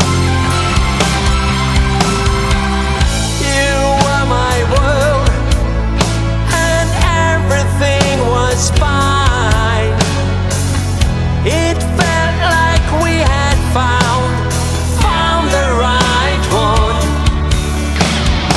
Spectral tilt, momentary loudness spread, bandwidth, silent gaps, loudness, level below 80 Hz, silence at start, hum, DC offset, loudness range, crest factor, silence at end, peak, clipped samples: -4.5 dB/octave; 3 LU; 12 kHz; none; -13 LUFS; -18 dBFS; 0 s; none; under 0.1%; 1 LU; 12 dB; 0 s; 0 dBFS; under 0.1%